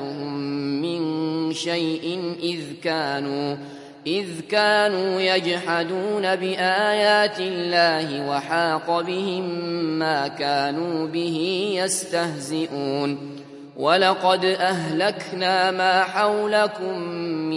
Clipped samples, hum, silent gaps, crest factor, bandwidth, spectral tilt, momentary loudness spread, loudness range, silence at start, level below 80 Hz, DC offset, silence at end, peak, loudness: under 0.1%; none; none; 20 dB; 11.5 kHz; -4 dB/octave; 9 LU; 5 LU; 0 s; -74 dBFS; under 0.1%; 0 s; -4 dBFS; -22 LUFS